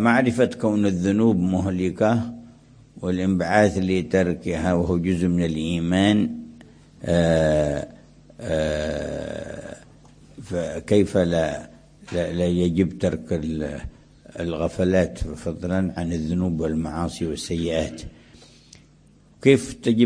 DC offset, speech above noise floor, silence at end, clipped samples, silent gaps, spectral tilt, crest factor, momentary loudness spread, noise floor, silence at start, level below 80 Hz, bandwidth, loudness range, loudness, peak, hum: under 0.1%; 32 dB; 0 s; under 0.1%; none; -6.5 dB/octave; 22 dB; 14 LU; -54 dBFS; 0 s; -42 dBFS; 10.5 kHz; 5 LU; -23 LUFS; -2 dBFS; none